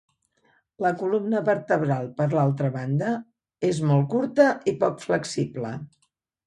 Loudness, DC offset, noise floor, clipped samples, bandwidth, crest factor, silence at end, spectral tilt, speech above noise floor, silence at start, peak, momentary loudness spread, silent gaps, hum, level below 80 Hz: -24 LUFS; under 0.1%; -66 dBFS; under 0.1%; 11.5 kHz; 18 dB; 0.6 s; -7 dB/octave; 42 dB; 0.8 s; -6 dBFS; 8 LU; none; none; -66 dBFS